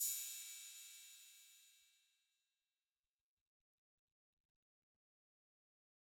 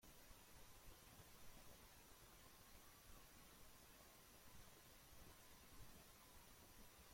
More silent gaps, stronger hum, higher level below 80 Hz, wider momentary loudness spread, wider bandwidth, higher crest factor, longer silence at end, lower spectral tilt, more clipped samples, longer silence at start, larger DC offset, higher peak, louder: neither; neither; second, under -90 dBFS vs -72 dBFS; first, 21 LU vs 1 LU; first, 19 kHz vs 16.5 kHz; first, 26 dB vs 16 dB; first, 4.25 s vs 0 s; second, 7.5 dB/octave vs -3 dB/octave; neither; about the same, 0 s vs 0 s; neither; first, -30 dBFS vs -48 dBFS; first, -48 LUFS vs -65 LUFS